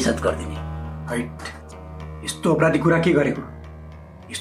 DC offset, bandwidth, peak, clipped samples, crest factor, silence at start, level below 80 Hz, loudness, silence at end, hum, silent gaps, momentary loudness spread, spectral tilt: under 0.1%; 15 kHz; -4 dBFS; under 0.1%; 20 dB; 0 s; -42 dBFS; -22 LUFS; 0 s; none; none; 22 LU; -5.5 dB/octave